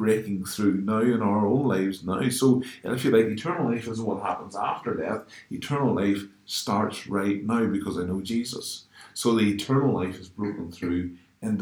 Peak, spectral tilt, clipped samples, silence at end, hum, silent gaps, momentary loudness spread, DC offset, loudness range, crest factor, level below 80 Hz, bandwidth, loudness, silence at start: -8 dBFS; -6 dB/octave; under 0.1%; 0 s; none; none; 10 LU; under 0.1%; 4 LU; 18 dB; -62 dBFS; 19.5 kHz; -26 LUFS; 0 s